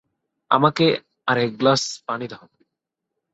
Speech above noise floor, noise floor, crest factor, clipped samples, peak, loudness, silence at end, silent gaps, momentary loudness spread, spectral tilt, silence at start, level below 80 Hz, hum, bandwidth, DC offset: 62 dB; -82 dBFS; 20 dB; under 0.1%; -2 dBFS; -20 LUFS; 1 s; none; 12 LU; -4.5 dB/octave; 0.5 s; -64 dBFS; none; 8.4 kHz; under 0.1%